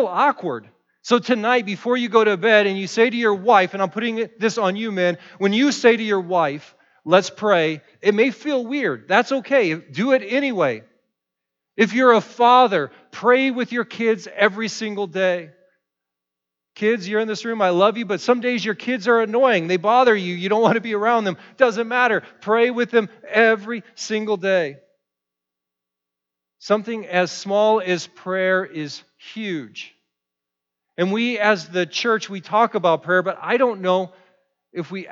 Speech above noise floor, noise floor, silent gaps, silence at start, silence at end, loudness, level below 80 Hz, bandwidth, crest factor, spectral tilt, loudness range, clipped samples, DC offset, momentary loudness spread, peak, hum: 65 dB; -84 dBFS; none; 0 s; 0 s; -19 LUFS; -80 dBFS; 7.8 kHz; 18 dB; -5 dB/octave; 6 LU; under 0.1%; under 0.1%; 12 LU; -2 dBFS; none